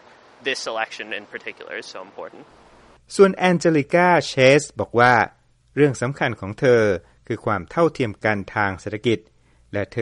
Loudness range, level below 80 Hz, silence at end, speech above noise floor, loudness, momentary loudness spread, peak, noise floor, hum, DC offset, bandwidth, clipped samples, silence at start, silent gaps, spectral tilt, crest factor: 6 LU; -54 dBFS; 0 s; 31 dB; -20 LUFS; 17 LU; -2 dBFS; -51 dBFS; none; under 0.1%; 11.5 kHz; under 0.1%; 0.45 s; none; -5.5 dB/octave; 18 dB